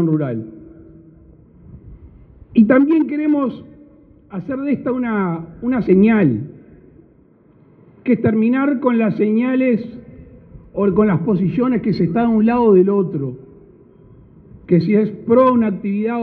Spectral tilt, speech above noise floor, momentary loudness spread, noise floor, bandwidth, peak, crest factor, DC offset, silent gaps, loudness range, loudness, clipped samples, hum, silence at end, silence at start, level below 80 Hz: -11.5 dB/octave; 35 dB; 14 LU; -51 dBFS; 4.7 kHz; -2 dBFS; 16 dB; under 0.1%; none; 3 LU; -16 LUFS; under 0.1%; none; 0 s; 0 s; -50 dBFS